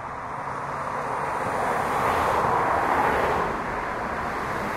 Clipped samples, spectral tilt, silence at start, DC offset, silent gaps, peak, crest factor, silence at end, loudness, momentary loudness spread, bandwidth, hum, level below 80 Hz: under 0.1%; -5 dB/octave; 0 s; under 0.1%; none; -10 dBFS; 16 dB; 0 s; -25 LUFS; 8 LU; 16 kHz; none; -46 dBFS